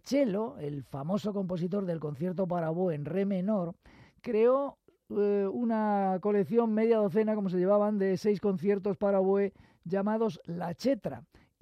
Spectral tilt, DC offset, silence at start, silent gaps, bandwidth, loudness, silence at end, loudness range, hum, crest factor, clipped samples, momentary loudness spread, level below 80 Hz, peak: -8 dB/octave; under 0.1%; 0.05 s; none; 13.5 kHz; -30 LUFS; 0.4 s; 4 LU; none; 16 dB; under 0.1%; 11 LU; -70 dBFS; -14 dBFS